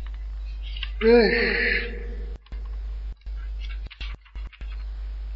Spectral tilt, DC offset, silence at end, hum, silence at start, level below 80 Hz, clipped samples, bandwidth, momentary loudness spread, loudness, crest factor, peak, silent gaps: -7.5 dB/octave; under 0.1%; 0 s; none; 0 s; -32 dBFS; under 0.1%; 5.8 kHz; 20 LU; -24 LUFS; 20 dB; -6 dBFS; none